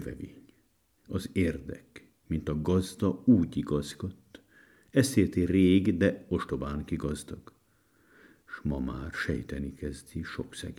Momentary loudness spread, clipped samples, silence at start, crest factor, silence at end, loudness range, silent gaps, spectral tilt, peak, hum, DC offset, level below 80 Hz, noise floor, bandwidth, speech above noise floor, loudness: 16 LU; under 0.1%; 0 s; 22 dB; 0.05 s; 9 LU; none; -6.5 dB/octave; -10 dBFS; none; under 0.1%; -50 dBFS; -69 dBFS; 15.5 kHz; 40 dB; -30 LUFS